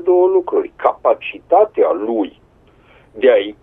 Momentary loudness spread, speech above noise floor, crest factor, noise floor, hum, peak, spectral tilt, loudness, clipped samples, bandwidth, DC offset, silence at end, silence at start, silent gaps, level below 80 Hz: 8 LU; 35 dB; 16 dB; -49 dBFS; none; 0 dBFS; -7.5 dB/octave; -16 LUFS; under 0.1%; 3.8 kHz; under 0.1%; 0.1 s; 0 s; none; -56 dBFS